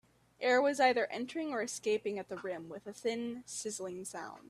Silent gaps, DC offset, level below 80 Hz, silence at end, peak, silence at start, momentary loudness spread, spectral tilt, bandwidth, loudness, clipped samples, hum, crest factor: none; under 0.1%; -78 dBFS; 0.05 s; -14 dBFS; 0.4 s; 13 LU; -3 dB/octave; 14 kHz; -35 LUFS; under 0.1%; none; 20 dB